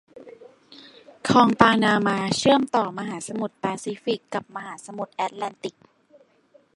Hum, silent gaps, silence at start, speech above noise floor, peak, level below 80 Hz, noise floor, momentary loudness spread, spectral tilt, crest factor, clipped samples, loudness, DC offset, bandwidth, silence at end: none; none; 0.15 s; 36 dB; 0 dBFS; -62 dBFS; -59 dBFS; 18 LU; -4.5 dB/octave; 24 dB; under 0.1%; -22 LUFS; under 0.1%; 11.5 kHz; 1.05 s